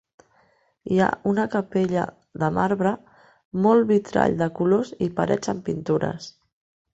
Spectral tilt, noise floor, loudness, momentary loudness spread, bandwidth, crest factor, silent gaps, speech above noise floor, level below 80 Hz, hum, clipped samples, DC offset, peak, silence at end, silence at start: -7 dB/octave; -63 dBFS; -23 LUFS; 12 LU; 8.2 kHz; 20 dB; 3.45-3.51 s; 40 dB; -56 dBFS; none; under 0.1%; under 0.1%; -4 dBFS; 0.65 s; 0.85 s